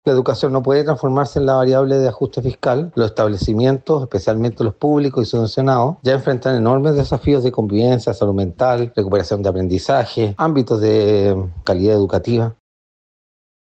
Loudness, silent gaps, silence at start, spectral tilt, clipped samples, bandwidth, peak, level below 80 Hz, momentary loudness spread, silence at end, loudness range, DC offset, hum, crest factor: -17 LUFS; none; 0.05 s; -8 dB/octave; under 0.1%; 8.4 kHz; -4 dBFS; -42 dBFS; 5 LU; 1.1 s; 1 LU; under 0.1%; none; 12 dB